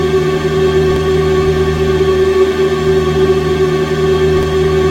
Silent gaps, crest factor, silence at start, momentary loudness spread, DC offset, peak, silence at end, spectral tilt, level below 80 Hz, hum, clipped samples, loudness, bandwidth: none; 12 dB; 0 s; 2 LU; under 0.1%; 0 dBFS; 0 s; -6.5 dB/octave; -26 dBFS; none; under 0.1%; -12 LUFS; 15 kHz